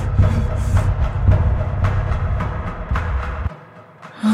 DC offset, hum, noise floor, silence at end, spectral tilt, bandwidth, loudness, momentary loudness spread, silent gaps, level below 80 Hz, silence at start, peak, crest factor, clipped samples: under 0.1%; none; -41 dBFS; 0 s; -8 dB/octave; 9.6 kHz; -20 LUFS; 11 LU; none; -22 dBFS; 0 s; -4 dBFS; 14 dB; under 0.1%